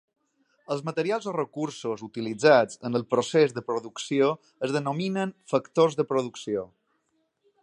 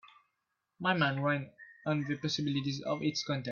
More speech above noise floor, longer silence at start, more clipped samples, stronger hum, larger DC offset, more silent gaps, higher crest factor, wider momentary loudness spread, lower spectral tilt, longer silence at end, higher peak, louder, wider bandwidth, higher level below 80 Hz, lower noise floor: about the same, 48 dB vs 51 dB; first, 0.7 s vs 0.05 s; neither; neither; neither; neither; about the same, 22 dB vs 20 dB; first, 11 LU vs 6 LU; about the same, -5.5 dB/octave vs -5.5 dB/octave; first, 0.95 s vs 0 s; first, -6 dBFS vs -14 dBFS; first, -26 LUFS vs -33 LUFS; first, 10.5 kHz vs 7.2 kHz; about the same, -74 dBFS vs -72 dBFS; second, -73 dBFS vs -84 dBFS